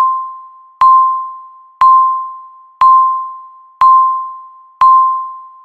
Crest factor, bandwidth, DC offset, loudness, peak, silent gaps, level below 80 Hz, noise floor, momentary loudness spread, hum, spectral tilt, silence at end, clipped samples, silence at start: 12 dB; 4.5 kHz; under 0.1%; -10 LUFS; 0 dBFS; none; -52 dBFS; -34 dBFS; 19 LU; none; -2 dB/octave; 0.15 s; under 0.1%; 0 s